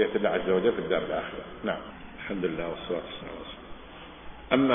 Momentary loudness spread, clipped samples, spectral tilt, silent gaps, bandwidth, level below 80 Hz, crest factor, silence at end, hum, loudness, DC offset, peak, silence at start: 20 LU; under 0.1%; -9.5 dB/octave; none; 3.7 kHz; -52 dBFS; 22 dB; 0 s; none; -30 LUFS; under 0.1%; -6 dBFS; 0 s